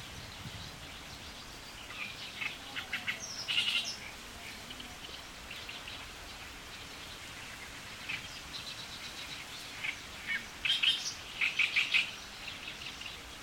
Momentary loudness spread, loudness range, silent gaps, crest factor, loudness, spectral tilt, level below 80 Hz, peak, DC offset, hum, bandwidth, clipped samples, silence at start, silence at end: 16 LU; 12 LU; none; 24 dB; -36 LUFS; -1 dB/octave; -60 dBFS; -16 dBFS; under 0.1%; none; 17 kHz; under 0.1%; 0 s; 0 s